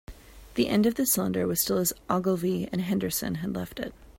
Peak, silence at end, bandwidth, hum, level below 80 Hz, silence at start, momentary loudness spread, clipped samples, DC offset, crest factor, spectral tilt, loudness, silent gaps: -10 dBFS; 0.05 s; 16.5 kHz; none; -52 dBFS; 0.1 s; 10 LU; under 0.1%; under 0.1%; 18 dB; -4.5 dB/octave; -27 LUFS; none